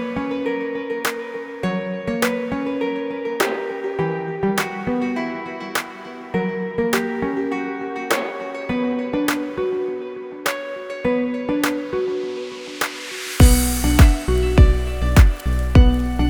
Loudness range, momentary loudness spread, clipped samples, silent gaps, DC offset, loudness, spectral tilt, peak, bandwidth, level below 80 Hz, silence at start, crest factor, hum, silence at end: 7 LU; 12 LU; under 0.1%; none; under 0.1%; -21 LUFS; -5.5 dB/octave; 0 dBFS; over 20 kHz; -24 dBFS; 0 s; 20 dB; none; 0 s